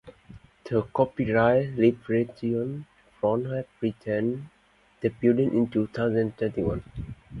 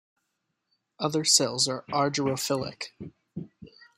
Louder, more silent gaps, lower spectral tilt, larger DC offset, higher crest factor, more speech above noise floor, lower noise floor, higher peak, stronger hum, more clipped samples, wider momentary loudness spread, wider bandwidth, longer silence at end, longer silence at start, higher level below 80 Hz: about the same, -26 LUFS vs -25 LUFS; neither; first, -9.5 dB/octave vs -2.5 dB/octave; neither; second, 18 dB vs 24 dB; second, 25 dB vs 53 dB; second, -50 dBFS vs -80 dBFS; about the same, -8 dBFS vs -6 dBFS; neither; neither; second, 12 LU vs 21 LU; second, 6 kHz vs 16 kHz; second, 0 s vs 0.15 s; second, 0.05 s vs 1 s; first, -50 dBFS vs -68 dBFS